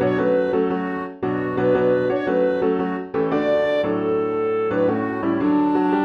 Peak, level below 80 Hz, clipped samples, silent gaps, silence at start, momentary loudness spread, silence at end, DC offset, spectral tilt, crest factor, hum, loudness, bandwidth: -8 dBFS; -54 dBFS; under 0.1%; none; 0 s; 5 LU; 0 s; under 0.1%; -8.5 dB/octave; 12 dB; none; -21 LUFS; 6.2 kHz